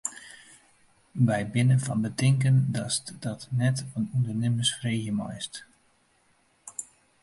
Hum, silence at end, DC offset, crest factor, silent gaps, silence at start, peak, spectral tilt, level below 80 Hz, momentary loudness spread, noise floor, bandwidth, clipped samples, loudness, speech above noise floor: none; 0.4 s; under 0.1%; 16 dB; none; 0.05 s; -12 dBFS; -5 dB/octave; -62 dBFS; 17 LU; -66 dBFS; 11.5 kHz; under 0.1%; -27 LUFS; 40 dB